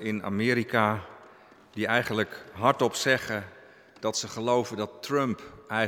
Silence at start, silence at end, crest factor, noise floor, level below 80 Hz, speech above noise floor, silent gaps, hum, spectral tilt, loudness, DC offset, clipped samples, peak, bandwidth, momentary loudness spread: 0 s; 0 s; 22 dB; -54 dBFS; -68 dBFS; 26 dB; none; none; -4.5 dB/octave; -28 LUFS; under 0.1%; under 0.1%; -6 dBFS; 17.5 kHz; 11 LU